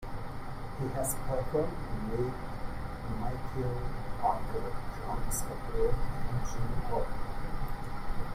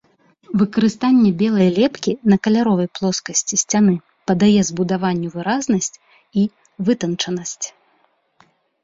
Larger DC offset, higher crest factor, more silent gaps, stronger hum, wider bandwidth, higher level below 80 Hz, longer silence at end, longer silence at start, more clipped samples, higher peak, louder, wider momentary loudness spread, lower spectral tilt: neither; about the same, 16 dB vs 16 dB; neither; neither; first, 15.5 kHz vs 7.8 kHz; first, -38 dBFS vs -56 dBFS; second, 0 s vs 1.15 s; second, 0 s vs 0.5 s; neither; second, -16 dBFS vs -4 dBFS; second, -36 LUFS vs -18 LUFS; about the same, 8 LU vs 9 LU; about the same, -6 dB/octave vs -5 dB/octave